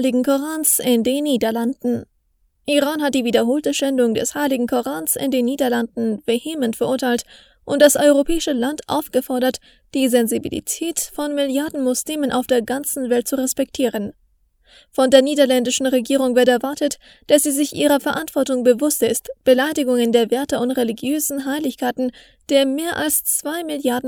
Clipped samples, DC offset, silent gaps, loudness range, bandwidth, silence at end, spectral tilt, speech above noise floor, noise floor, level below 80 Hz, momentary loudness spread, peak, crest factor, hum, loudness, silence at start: under 0.1%; under 0.1%; none; 3 LU; over 20 kHz; 0 s; -3 dB/octave; 45 dB; -63 dBFS; -48 dBFS; 8 LU; 0 dBFS; 18 dB; none; -19 LUFS; 0 s